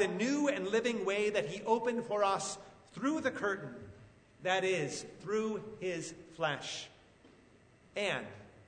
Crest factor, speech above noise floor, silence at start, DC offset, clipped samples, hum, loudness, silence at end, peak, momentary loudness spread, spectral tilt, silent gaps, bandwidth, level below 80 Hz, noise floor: 20 dB; 28 dB; 0 s; under 0.1%; under 0.1%; none; -35 LUFS; 0.05 s; -16 dBFS; 14 LU; -4 dB/octave; none; 9.6 kHz; -72 dBFS; -63 dBFS